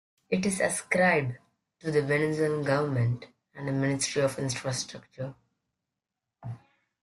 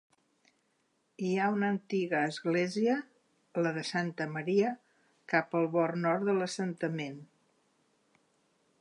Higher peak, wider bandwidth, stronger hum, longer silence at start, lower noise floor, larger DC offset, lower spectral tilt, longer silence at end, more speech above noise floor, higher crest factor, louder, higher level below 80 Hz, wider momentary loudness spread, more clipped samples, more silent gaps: first, -10 dBFS vs -14 dBFS; first, 12.5 kHz vs 11 kHz; neither; second, 0.3 s vs 1.2 s; first, -87 dBFS vs -75 dBFS; neither; about the same, -5 dB/octave vs -6 dB/octave; second, 0.45 s vs 1.55 s; first, 60 dB vs 44 dB; about the same, 20 dB vs 20 dB; first, -28 LUFS vs -32 LUFS; first, -64 dBFS vs -84 dBFS; first, 19 LU vs 7 LU; neither; neither